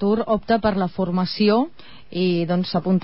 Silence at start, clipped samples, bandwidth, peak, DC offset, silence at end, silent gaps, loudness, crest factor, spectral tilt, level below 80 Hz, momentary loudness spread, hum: 0 s; under 0.1%; 5.8 kHz; -6 dBFS; 0.9%; 0 s; none; -21 LUFS; 14 dB; -11 dB/octave; -48 dBFS; 5 LU; none